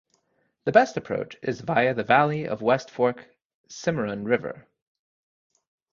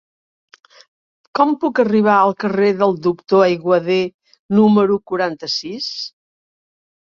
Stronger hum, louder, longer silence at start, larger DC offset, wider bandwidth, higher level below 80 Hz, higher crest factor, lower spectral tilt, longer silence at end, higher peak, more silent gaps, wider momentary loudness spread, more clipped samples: neither; second, -24 LUFS vs -16 LUFS; second, 0.65 s vs 1.35 s; neither; about the same, 7.4 kHz vs 7.2 kHz; about the same, -62 dBFS vs -62 dBFS; first, 22 dB vs 16 dB; about the same, -6 dB/octave vs -6.5 dB/octave; first, 1.3 s vs 0.95 s; about the same, -4 dBFS vs -2 dBFS; about the same, 3.45-3.64 s vs 4.14-4.19 s, 4.39-4.49 s; about the same, 12 LU vs 11 LU; neither